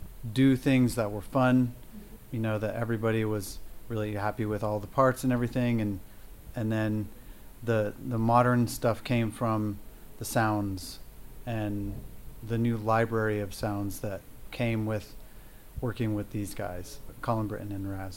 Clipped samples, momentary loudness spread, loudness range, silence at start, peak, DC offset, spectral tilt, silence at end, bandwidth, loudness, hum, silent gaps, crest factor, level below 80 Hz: under 0.1%; 17 LU; 6 LU; 0 s; -10 dBFS; under 0.1%; -6.5 dB/octave; 0 s; 16.5 kHz; -30 LUFS; none; none; 20 dB; -48 dBFS